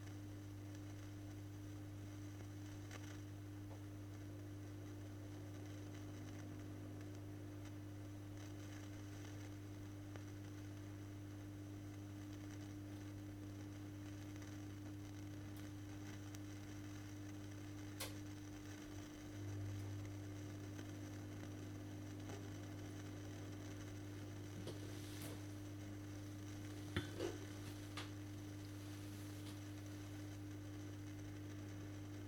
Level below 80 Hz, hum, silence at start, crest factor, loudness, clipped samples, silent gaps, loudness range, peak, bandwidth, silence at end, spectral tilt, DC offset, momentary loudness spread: -68 dBFS; none; 0 s; 24 dB; -52 LUFS; under 0.1%; none; 3 LU; -26 dBFS; 19 kHz; 0 s; -5.5 dB/octave; under 0.1%; 3 LU